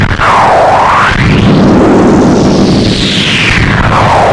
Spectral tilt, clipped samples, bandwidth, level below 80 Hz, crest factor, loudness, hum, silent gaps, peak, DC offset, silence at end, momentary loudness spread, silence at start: -5.5 dB/octave; 1%; 11.5 kHz; -20 dBFS; 6 dB; -6 LUFS; none; none; 0 dBFS; under 0.1%; 0 s; 2 LU; 0 s